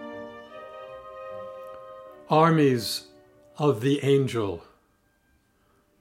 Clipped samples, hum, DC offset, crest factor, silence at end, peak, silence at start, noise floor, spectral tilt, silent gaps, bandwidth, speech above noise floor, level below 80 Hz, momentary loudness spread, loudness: under 0.1%; none; under 0.1%; 20 dB; 1.4 s; -6 dBFS; 0 s; -66 dBFS; -6 dB/octave; none; 16 kHz; 44 dB; -68 dBFS; 22 LU; -24 LUFS